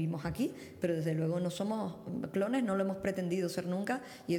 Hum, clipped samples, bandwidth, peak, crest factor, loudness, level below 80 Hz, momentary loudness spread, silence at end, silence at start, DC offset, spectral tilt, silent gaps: none; under 0.1%; 18.5 kHz; -20 dBFS; 14 dB; -35 LUFS; -64 dBFS; 6 LU; 0 s; 0 s; under 0.1%; -6.5 dB/octave; none